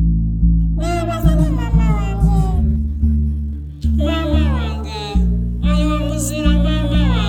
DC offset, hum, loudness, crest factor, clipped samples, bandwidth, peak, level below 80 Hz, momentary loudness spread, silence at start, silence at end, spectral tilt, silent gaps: under 0.1%; none; -18 LUFS; 14 dB; under 0.1%; 15.5 kHz; 0 dBFS; -18 dBFS; 5 LU; 0 s; 0 s; -6.5 dB/octave; none